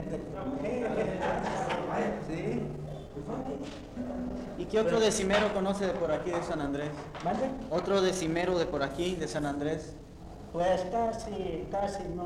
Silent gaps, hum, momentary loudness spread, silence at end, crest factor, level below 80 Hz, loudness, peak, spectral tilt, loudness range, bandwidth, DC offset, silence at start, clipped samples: none; none; 11 LU; 0 s; 16 dB; -50 dBFS; -32 LUFS; -16 dBFS; -5 dB/octave; 4 LU; 14 kHz; under 0.1%; 0 s; under 0.1%